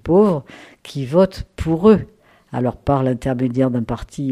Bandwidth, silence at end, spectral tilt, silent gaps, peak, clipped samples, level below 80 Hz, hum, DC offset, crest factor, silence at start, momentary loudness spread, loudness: 13 kHz; 0 s; -8.5 dB/octave; none; -2 dBFS; under 0.1%; -38 dBFS; none; under 0.1%; 16 dB; 0.05 s; 14 LU; -18 LUFS